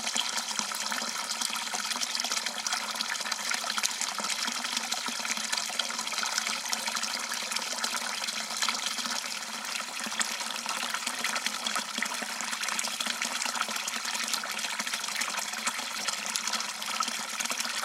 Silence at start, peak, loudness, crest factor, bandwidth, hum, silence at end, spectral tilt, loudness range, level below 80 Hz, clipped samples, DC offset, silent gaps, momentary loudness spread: 0 s; -6 dBFS; -30 LUFS; 26 dB; 16 kHz; none; 0 s; 1 dB/octave; 1 LU; -82 dBFS; under 0.1%; under 0.1%; none; 2 LU